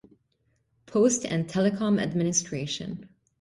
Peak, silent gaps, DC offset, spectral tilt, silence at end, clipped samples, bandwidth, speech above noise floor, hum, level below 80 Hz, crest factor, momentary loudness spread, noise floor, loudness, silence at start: -10 dBFS; none; under 0.1%; -4.5 dB/octave; 0.35 s; under 0.1%; 11.5 kHz; 46 dB; none; -62 dBFS; 18 dB; 10 LU; -72 dBFS; -26 LUFS; 0.9 s